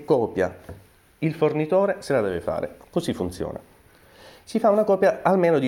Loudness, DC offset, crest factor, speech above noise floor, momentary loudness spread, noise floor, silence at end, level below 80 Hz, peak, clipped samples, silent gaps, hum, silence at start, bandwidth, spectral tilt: -23 LUFS; under 0.1%; 18 dB; 31 dB; 11 LU; -53 dBFS; 0 s; -54 dBFS; -4 dBFS; under 0.1%; none; none; 0 s; 16.5 kHz; -7 dB/octave